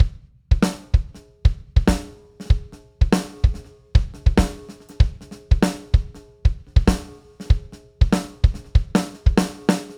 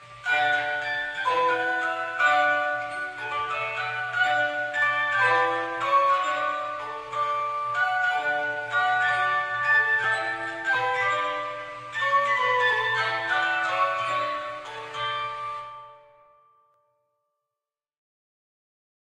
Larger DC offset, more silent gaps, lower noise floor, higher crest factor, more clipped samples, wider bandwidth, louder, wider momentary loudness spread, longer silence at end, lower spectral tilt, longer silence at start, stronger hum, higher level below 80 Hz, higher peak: neither; neither; second, -39 dBFS vs -89 dBFS; about the same, 18 dB vs 16 dB; neither; first, 16 kHz vs 13 kHz; about the same, -22 LUFS vs -24 LUFS; first, 15 LU vs 11 LU; second, 0.05 s vs 3.05 s; first, -6.5 dB/octave vs -2.5 dB/octave; about the same, 0 s vs 0 s; neither; first, -22 dBFS vs -68 dBFS; first, -2 dBFS vs -10 dBFS